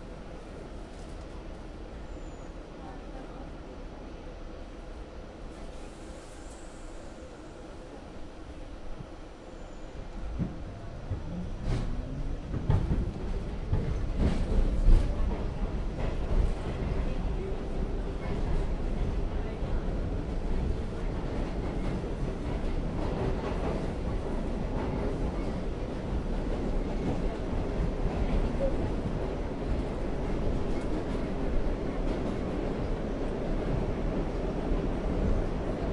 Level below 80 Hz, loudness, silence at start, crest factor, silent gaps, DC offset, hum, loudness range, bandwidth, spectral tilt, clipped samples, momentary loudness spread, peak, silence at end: -32 dBFS; -34 LUFS; 0 s; 22 dB; none; under 0.1%; none; 13 LU; 10 kHz; -7.5 dB/octave; under 0.1%; 14 LU; -8 dBFS; 0 s